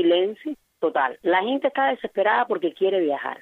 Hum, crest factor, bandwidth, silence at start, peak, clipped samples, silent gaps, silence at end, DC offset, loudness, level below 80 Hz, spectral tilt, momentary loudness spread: none; 14 dB; 4.2 kHz; 0 s; -8 dBFS; under 0.1%; none; 0.05 s; under 0.1%; -23 LUFS; -76 dBFS; -6.5 dB/octave; 6 LU